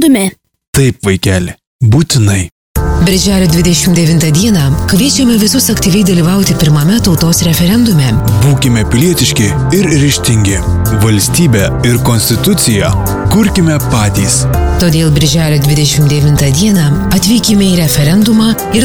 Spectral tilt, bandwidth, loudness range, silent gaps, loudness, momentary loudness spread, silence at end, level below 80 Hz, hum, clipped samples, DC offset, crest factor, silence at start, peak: -5 dB/octave; over 20 kHz; 1 LU; 0.67-0.73 s, 1.67-1.79 s, 2.52-2.75 s; -9 LUFS; 3 LU; 0 s; -22 dBFS; none; under 0.1%; 1%; 8 dB; 0 s; 0 dBFS